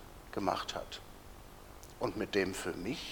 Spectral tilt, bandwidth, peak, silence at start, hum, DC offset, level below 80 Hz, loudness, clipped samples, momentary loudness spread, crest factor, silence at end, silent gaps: -4 dB/octave; over 20 kHz; -16 dBFS; 0 s; none; under 0.1%; -56 dBFS; -37 LUFS; under 0.1%; 20 LU; 22 dB; 0 s; none